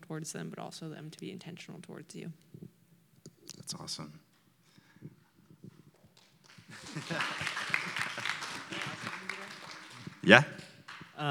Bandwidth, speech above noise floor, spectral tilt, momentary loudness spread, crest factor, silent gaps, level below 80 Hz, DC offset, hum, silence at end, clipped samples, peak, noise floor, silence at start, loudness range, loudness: 19 kHz; 35 dB; -4 dB/octave; 18 LU; 36 dB; none; -80 dBFS; under 0.1%; none; 0 s; under 0.1%; 0 dBFS; -67 dBFS; 0 s; 17 LU; -32 LUFS